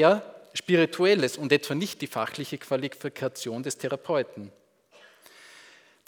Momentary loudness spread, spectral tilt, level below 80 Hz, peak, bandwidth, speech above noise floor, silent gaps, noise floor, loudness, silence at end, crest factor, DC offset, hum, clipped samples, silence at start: 13 LU; -4.5 dB/octave; -80 dBFS; -6 dBFS; over 20 kHz; 31 dB; none; -57 dBFS; -27 LUFS; 1.6 s; 22 dB; under 0.1%; none; under 0.1%; 0 s